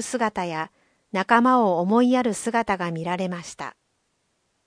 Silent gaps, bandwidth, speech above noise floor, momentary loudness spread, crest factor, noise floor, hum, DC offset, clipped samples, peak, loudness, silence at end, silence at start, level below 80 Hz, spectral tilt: none; 10.5 kHz; 49 dB; 16 LU; 22 dB; -71 dBFS; none; under 0.1%; under 0.1%; -2 dBFS; -22 LUFS; 0.95 s; 0 s; -62 dBFS; -5 dB/octave